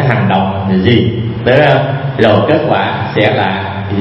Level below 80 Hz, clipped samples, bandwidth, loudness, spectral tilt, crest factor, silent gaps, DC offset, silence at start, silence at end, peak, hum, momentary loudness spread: -40 dBFS; 0.2%; 5.8 kHz; -11 LUFS; -8.5 dB/octave; 10 dB; none; under 0.1%; 0 s; 0 s; 0 dBFS; none; 7 LU